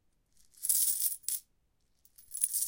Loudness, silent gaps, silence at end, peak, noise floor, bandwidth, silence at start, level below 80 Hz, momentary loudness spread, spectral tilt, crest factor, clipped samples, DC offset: -30 LUFS; none; 0 s; -10 dBFS; -73 dBFS; 17 kHz; 0.6 s; -74 dBFS; 11 LU; 3.5 dB/octave; 26 dB; under 0.1%; under 0.1%